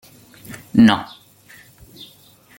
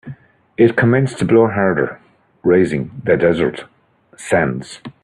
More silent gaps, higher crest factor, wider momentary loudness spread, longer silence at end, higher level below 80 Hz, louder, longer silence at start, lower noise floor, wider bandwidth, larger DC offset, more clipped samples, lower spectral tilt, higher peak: neither; about the same, 20 dB vs 16 dB; first, 27 LU vs 20 LU; first, 1.55 s vs 0.15 s; about the same, -54 dBFS vs -50 dBFS; about the same, -15 LUFS vs -16 LUFS; first, 0.5 s vs 0.05 s; first, -49 dBFS vs -37 dBFS; first, 17 kHz vs 11 kHz; neither; neither; about the same, -6 dB/octave vs -7 dB/octave; about the same, -2 dBFS vs 0 dBFS